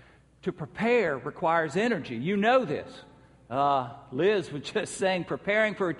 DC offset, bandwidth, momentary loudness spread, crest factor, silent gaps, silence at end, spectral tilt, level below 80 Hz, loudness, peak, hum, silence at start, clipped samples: under 0.1%; 11.5 kHz; 11 LU; 16 dB; none; 0 s; -5.5 dB/octave; -64 dBFS; -28 LUFS; -10 dBFS; none; 0.45 s; under 0.1%